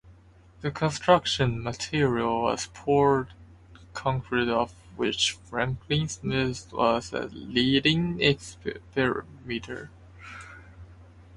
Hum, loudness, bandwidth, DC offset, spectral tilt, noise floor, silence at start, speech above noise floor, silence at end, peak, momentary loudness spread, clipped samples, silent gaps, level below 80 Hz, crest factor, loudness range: none; -26 LUFS; 11.5 kHz; under 0.1%; -5 dB/octave; -54 dBFS; 0.05 s; 27 dB; 0 s; -6 dBFS; 17 LU; under 0.1%; none; -50 dBFS; 22 dB; 3 LU